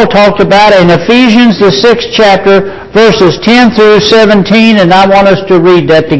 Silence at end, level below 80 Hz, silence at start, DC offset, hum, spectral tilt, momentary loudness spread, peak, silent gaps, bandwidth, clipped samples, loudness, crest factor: 0 s; -34 dBFS; 0 s; under 0.1%; none; -5.5 dB/octave; 3 LU; 0 dBFS; none; 8 kHz; 10%; -4 LUFS; 4 dB